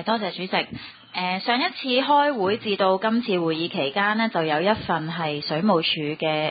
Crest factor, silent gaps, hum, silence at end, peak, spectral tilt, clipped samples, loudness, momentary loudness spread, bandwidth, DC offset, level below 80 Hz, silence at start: 18 dB; none; none; 0 s; -6 dBFS; -10 dB/octave; under 0.1%; -23 LUFS; 7 LU; 5 kHz; under 0.1%; -60 dBFS; 0 s